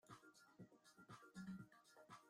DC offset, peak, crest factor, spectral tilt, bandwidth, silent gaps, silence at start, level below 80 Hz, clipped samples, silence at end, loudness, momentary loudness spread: under 0.1%; -46 dBFS; 16 dB; -5.5 dB/octave; 15.5 kHz; none; 0.05 s; -90 dBFS; under 0.1%; 0 s; -62 LUFS; 12 LU